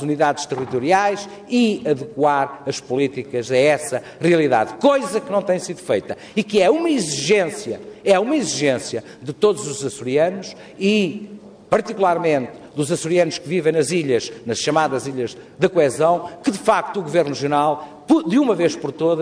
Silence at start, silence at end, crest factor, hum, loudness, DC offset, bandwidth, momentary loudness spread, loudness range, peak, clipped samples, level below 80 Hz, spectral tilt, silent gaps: 0 s; 0 s; 16 dB; none; -19 LUFS; under 0.1%; 11 kHz; 9 LU; 2 LU; -2 dBFS; under 0.1%; -62 dBFS; -4.5 dB/octave; none